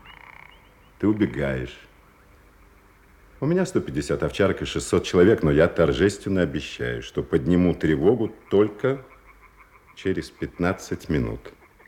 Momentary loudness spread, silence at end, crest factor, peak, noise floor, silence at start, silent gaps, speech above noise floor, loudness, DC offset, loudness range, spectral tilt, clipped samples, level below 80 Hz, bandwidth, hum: 12 LU; 0.4 s; 20 dB; -4 dBFS; -53 dBFS; 0.05 s; none; 31 dB; -23 LUFS; under 0.1%; 7 LU; -6.5 dB/octave; under 0.1%; -44 dBFS; 15.5 kHz; none